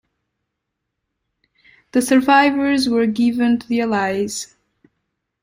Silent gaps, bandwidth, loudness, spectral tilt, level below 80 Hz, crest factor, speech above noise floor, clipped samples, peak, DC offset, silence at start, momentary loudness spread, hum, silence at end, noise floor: none; 16 kHz; -17 LUFS; -4 dB/octave; -58 dBFS; 18 dB; 62 dB; under 0.1%; -2 dBFS; under 0.1%; 1.95 s; 10 LU; none; 1 s; -78 dBFS